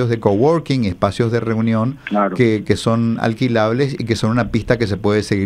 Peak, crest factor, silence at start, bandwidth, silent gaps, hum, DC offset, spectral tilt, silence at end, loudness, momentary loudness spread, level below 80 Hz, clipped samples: 0 dBFS; 16 dB; 0 s; 11.5 kHz; none; none; under 0.1%; -7 dB/octave; 0 s; -17 LUFS; 4 LU; -42 dBFS; under 0.1%